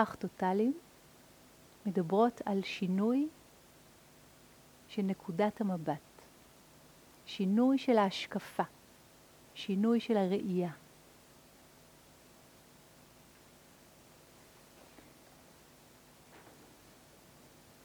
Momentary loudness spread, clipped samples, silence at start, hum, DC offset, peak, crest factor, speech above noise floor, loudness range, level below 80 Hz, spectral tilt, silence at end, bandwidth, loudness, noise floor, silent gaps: 24 LU; under 0.1%; 0 s; none; under 0.1%; -14 dBFS; 24 dB; 28 dB; 6 LU; -74 dBFS; -6.5 dB/octave; 1.45 s; over 20 kHz; -33 LUFS; -60 dBFS; none